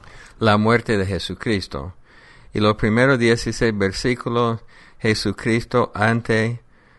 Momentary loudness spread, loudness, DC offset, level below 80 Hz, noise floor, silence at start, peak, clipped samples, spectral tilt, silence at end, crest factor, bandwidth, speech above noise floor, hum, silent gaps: 9 LU; -20 LUFS; under 0.1%; -42 dBFS; -46 dBFS; 0.15 s; -2 dBFS; under 0.1%; -6 dB/octave; 0.4 s; 18 dB; 11.5 kHz; 27 dB; none; none